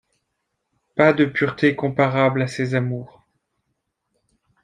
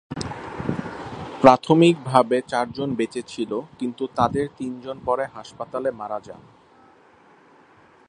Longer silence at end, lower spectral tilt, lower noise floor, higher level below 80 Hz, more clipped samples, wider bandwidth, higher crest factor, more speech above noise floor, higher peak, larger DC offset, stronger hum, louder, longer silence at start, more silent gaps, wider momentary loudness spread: second, 1.55 s vs 1.7 s; about the same, -7 dB/octave vs -6.5 dB/octave; first, -76 dBFS vs -53 dBFS; second, -62 dBFS vs -54 dBFS; neither; about the same, 10 kHz vs 10.5 kHz; about the same, 20 dB vs 24 dB; first, 57 dB vs 32 dB; about the same, -2 dBFS vs 0 dBFS; neither; neither; about the same, -20 LUFS vs -22 LUFS; first, 0.95 s vs 0.1 s; neither; second, 10 LU vs 16 LU